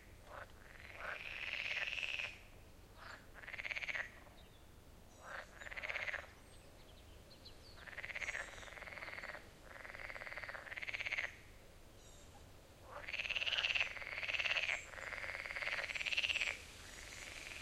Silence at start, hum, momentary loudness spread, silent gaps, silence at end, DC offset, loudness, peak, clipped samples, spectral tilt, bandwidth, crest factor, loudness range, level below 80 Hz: 0 s; none; 24 LU; none; 0 s; under 0.1%; -42 LUFS; -20 dBFS; under 0.1%; -1.5 dB/octave; 16 kHz; 26 dB; 10 LU; -64 dBFS